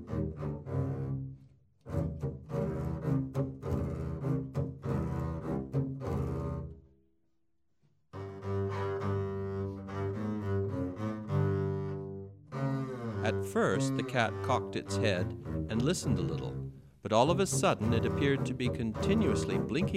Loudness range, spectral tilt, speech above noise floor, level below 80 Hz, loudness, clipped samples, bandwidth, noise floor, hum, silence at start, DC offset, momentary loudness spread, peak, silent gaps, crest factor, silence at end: 8 LU; -6 dB/octave; 51 dB; -50 dBFS; -33 LUFS; under 0.1%; 14 kHz; -81 dBFS; none; 0 s; under 0.1%; 10 LU; -12 dBFS; none; 22 dB; 0 s